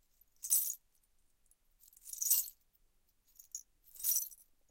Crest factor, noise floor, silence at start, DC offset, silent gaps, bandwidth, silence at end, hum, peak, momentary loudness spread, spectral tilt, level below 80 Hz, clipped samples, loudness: 26 dB; -73 dBFS; 0.45 s; under 0.1%; none; 17 kHz; 0.35 s; none; -14 dBFS; 18 LU; 4.5 dB/octave; -76 dBFS; under 0.1%; -33 LUFS